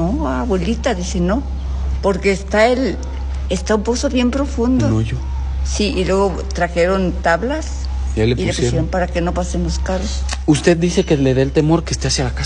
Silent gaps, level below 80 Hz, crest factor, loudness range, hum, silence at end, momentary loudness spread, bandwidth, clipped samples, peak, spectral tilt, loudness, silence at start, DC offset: none; -24 dBFS; 16 dB; 2 LU; none; 0 s; 7 LU; 10.5 kHz; under 0.1%; 0 dBFS; -5.5 dB/octave; -18 LUFS; 0 s; under 0.1%